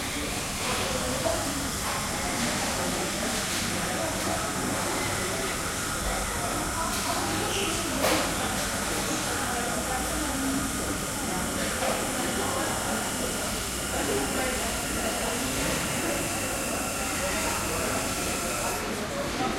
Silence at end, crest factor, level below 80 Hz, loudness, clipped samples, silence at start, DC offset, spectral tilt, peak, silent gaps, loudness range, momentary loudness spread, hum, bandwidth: 0 s; 18 dB; -42 dBFS; -27 LUFS; under 0.1%; 0 s; under 0.1%; -2.5 dB/octave; -10 dBFS; none; 1 LU; 2 LU; none; 16 kHz